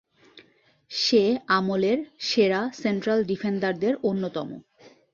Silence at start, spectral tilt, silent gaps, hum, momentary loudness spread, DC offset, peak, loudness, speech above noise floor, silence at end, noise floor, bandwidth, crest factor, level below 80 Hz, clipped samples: 0.35 s; -5 dB/octave; none; none; 10 LU; under 0.1%; -8 dBFS; -24 LUFS; 36 dB; 0.25 s; -60 dBFS; 7.4 kHz; 18 dB; -68 dBFS; under 0.1%